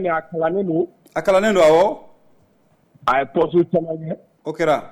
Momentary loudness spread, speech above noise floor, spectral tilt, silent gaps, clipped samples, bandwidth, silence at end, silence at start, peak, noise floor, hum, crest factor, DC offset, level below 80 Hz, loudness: 15 LU; 41 dB; -6 dB/octave; none; under 0.1%; 14 kHz; 0 s; 0 s; -6 dBFS; -59 dBFS; none; 14 dB; under 0.1%; -52 dBFS; -19 LUFS